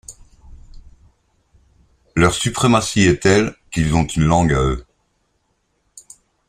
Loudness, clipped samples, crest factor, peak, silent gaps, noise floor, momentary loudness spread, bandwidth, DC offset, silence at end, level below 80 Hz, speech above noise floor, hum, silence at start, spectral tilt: -17 LUFS; under 0.1%; 20 dB; 0 dBFS; none; -67 dBFS; 9 LU; 15 kHz; under 0.1%; 1.65 s; -34 dBFS; 51 dB; none; 0.1 s; -5 dB/octave